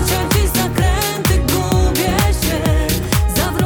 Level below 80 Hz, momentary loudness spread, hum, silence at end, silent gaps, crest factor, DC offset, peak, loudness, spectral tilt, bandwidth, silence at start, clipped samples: -20 dBFS; 2 LU; none; 0 s; none; 14 dB; under 0.1%; -2 dBFS; -16 LUFS; -4.5 dB/octave; over 20 kHz; 0 s; under 0.1%